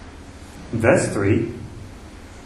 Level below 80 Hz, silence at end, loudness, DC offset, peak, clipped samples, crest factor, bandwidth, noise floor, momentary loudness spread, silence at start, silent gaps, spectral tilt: -44 dBFS; 0 s; -20 LUFS; under 0.1%; -2 dBFS; under 0.1%; 22 dB; 12.5 kHz; -39 dBFS; 23 LU; 0 s; none; -6.5 dB/octave